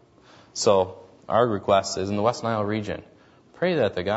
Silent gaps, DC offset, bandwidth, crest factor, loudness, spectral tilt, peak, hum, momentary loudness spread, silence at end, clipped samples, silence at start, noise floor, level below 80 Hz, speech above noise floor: none; under 0.1%; 8 kHz; 20 dB; -24 LUFS; -5 dB/octave; -6 dBFS; none; 10 LU; 0 s; under 0.1%; 0.55 s; -53 dBFS; -60 dBFS; 30 dB